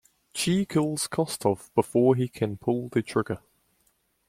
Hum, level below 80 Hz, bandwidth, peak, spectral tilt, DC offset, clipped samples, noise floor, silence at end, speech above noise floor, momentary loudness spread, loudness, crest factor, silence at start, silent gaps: none; -62 dBFS; 16 kHz; -8 dBFS; -5.5 dB/octave; under 0.1%; under 0.1%; -70 dBFS; 0.9 s; 44 dB; 7 LU; -26 LUFS; 20 dB; 0.35 s; none